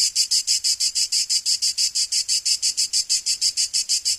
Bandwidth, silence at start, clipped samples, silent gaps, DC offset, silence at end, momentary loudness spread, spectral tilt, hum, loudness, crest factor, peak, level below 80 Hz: 15.5 kHz; 0 s; under 0.1%; none; under 0.1%; 0 s; 2 LU; 5 dB/octave; none; -19 LUFS; 16 dB; -6 dBFS; -62 dBFS